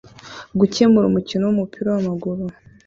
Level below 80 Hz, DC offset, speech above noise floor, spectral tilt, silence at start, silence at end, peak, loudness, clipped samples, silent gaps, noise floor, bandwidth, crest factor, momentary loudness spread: -52 dBFS; under 0.1%; 21 dB; -7 dB/octave; 0.25 s; 0.35 s; -2 dBFS; -19 LUFS; under 0.1%; none; -39 dBFS; 7.6 kHz; 16 dB; 16 LU